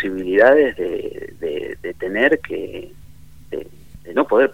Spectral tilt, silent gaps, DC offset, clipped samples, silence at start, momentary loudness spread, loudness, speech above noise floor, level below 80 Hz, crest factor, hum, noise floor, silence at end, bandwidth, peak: -6 dB/octave; none; 0.8%; under 0.1%; 0 s; 19 LU; -18 LUFS; 26 dB; -48 dBFS; 18 dB; none; -44 dBFS; 0 s; 16 kHz; 0 dBFS